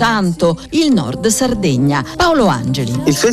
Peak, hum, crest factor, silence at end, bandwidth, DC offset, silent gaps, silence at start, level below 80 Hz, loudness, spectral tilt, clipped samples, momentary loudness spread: -2 dBFS; none; 12 dB; 0 s; 15 kHz; under 0.1%; none; 0 s; -36 dBFS; -14 LUFS; -5 dB/octave; under 0.1%; 4 LU